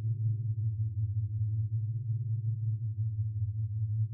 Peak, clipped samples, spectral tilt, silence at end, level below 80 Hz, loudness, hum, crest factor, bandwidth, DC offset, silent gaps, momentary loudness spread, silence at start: -24 dBFS; under 0.1%; -18 dB/octave; 0 s; -62 dBFS; -34 LUFS; none; 8 dB; 0.4 kHz; under 0.1%; none; 2 LU; 0 s